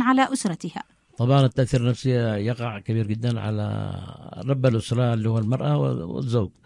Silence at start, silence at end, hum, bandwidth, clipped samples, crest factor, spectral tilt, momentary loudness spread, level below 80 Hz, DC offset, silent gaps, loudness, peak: 0 s; 0.15 s; none; 11.5 kHz; under 0.1%; 16 dB; -7 dB/octave; 13 LU; -52 dBFS; under 0.1%; none; -24 LUFS; -6 dBFS